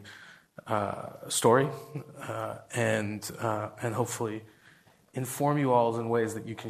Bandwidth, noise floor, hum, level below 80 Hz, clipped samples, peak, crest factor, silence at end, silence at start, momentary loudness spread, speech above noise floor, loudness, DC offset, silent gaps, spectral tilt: 14.5 kHz; -60 dBFS; none; -70 dBFS; under 0.1%; -8 dBFS; 22 dB; 0 s; 0 s; 17 LU; 30 dB; -30 LUFS; under 0.1%; none; -5 dB/octave